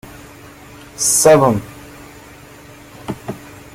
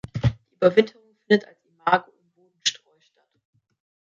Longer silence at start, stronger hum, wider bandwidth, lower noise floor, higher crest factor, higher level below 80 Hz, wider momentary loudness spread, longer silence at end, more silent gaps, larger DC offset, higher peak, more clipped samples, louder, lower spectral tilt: about the same, 0.05 s vs 0.15 s; neither; first, 16.5 kHz vs 7.8 kHz; second, -40 dBFS vs -66 dBFS; about the same, 18 dB vs 22 dB; about the same, -48 dBFS vs -48 dBFS; first, 28 LU vs 7 LU; second, 0.15 s vs 1.35 s; neither; neither; about the same, 0 dBFS vs -2 dBFS; neither; first, -13 LUFS vs -23 LUFS; second, -3.5 dB/octave vs -5 dB/octave